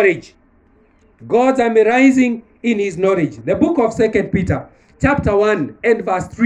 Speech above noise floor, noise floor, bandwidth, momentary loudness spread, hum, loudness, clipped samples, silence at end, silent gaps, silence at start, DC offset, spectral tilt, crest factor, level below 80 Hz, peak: 38 dB; -52 dBFS; 9.4 kHz; 8 LU; none; -16 LUFS; under 0.1%; 0 s; none; 0 s; under 0.1%; -7 dB/octave; 14 dB; -42 dBFS; -2 dBFS